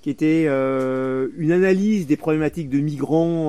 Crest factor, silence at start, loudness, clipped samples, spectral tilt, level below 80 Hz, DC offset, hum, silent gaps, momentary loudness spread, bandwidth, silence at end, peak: 14 dB; 0.05 s; -20 LUFS; under 0.1%; -8 dB/octave; -54 dBFS; 0.4%; none; none; 5 LU; 13.5 kHz; 0 s; -6 dBFS